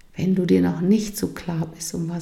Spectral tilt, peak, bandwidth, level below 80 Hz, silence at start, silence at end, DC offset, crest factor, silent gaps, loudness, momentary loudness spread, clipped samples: -6.5 dB/octave; -6 dBFS; 14.5 kHz; -50 dBFS; 0.15 s; 0 s; under 0.1%; 16 dB; none; -22 LUFS; 9 LU; under 0.1%